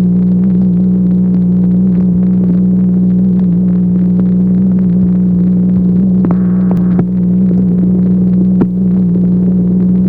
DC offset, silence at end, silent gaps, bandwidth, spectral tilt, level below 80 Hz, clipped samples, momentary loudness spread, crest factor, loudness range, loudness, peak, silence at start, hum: under 0.1%; 0 s; none; 2 kHz; -13.5 dB/octave; -32 dBFS; under 0.1%; 1 LU; 8 dB; 0 LU; -10 LUFS; 0 dBFS; 0 s; 60 Hz at -20 dBFS